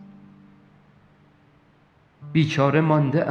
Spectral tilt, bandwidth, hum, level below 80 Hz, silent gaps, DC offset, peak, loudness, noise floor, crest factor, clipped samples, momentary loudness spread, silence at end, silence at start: -7.5 dB/octave; 6.8 kHz; none; -66 dBFS; none; under 0.1%; -4 dBFS; -21 LUFS; -58 dBFS; 20 dB; under 0.1%; 5 LU; 0 s; 0 s